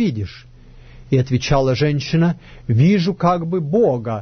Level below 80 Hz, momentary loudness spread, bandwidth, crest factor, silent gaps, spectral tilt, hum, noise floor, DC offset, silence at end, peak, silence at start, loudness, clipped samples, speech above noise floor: -38 dBFS; 6 LU; 6.6 kHz; 14 dB; none; -7.5 dB/octave; none; -41 dBFS; under 0.1%; 0 s; -4 dBFS; 0 s; -18 LUFS; under 0.1%; 24 dB